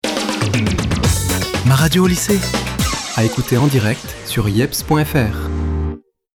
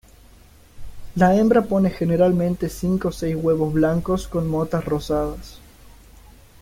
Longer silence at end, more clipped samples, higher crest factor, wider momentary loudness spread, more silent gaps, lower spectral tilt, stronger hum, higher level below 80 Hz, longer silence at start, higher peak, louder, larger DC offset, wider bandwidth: second, 0.35 s vs 0.75 s; neither; about the same, 14 dB vs 18 dB; about the same, 8 LU vs 8 LU; neither; second, -5 dB/octave vs -7.5 dB/octave; neither; first, -30 dBFS vs -40 dBFS; second, 0.05 s vs 0.75 s; about the same, -2 dBFS vs -4 dBFS; first, -17 LUFS vs -21 LUFS; neither; first, over 20 kHz vs 16 kHz